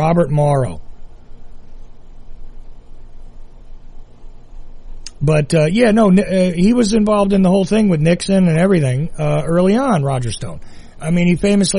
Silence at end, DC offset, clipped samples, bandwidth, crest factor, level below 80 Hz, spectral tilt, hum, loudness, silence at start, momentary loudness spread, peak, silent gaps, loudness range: 0 s; under 0.1%; under 0.1%; 11.5 kHz; 14 dB; -32 dBFS; -6.5 dB/octave; none; -14 LUFS; 0 s; 11 LU; -2 dBFS; none; 10 LU